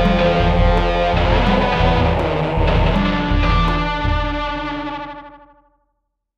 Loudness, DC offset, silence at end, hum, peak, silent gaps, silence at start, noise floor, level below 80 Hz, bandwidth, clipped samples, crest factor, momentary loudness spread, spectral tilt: -17 LUFS; under 0.1%; 1 s; none; -2 dBFS; none; 0 s; -72 dBFS; -22 dBFS; 7.2 kHz; under 0.1%; 14 dB; 9 LU; -7.5 dB/octave